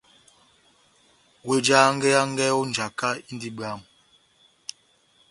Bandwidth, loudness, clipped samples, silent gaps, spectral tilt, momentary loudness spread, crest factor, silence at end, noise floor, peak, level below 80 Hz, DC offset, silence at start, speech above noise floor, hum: 11.5 kHz; -22 LUFS; under 0.1%; none; -3.5 dB/octave; 22 LU; 24 dB; 1.5 s; -62 dBFS; -4 dBFS; -68 dBFS; under 0.1%; 1.45 s; 39 dB; none